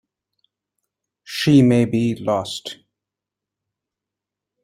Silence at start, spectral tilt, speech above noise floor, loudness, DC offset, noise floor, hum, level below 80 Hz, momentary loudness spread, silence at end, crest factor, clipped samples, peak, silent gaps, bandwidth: 1.3 s; -6.5 dB/octave; 69 dB; -18 LUFS; under 0.1%; -86 dBFS; none; -58 dBFS; 17 LU; 1.9 s; 20 dB; under 0.1%; -2 dBFS; none; 15.5 kHz